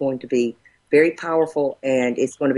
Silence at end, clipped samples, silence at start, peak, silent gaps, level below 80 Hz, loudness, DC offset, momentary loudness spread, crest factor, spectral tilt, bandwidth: 0 s; under 0.1%; 0 s; -4 dBFS; none; -64 dBFS; -20 LUFS; under 0.1%; 5 LU; 16 dB; -6 dB/octave; 11.5 kHz